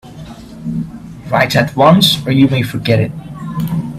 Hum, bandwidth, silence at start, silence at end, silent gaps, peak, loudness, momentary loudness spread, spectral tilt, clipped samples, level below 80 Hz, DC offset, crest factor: none; 16 kHz; 0.05 s; 0 s; none; 0 dBFS; -13 LUFS; 20 LU; -5.5 dB/octave; under 0.1%; -42 dBFS; under 0.1%; 14 dB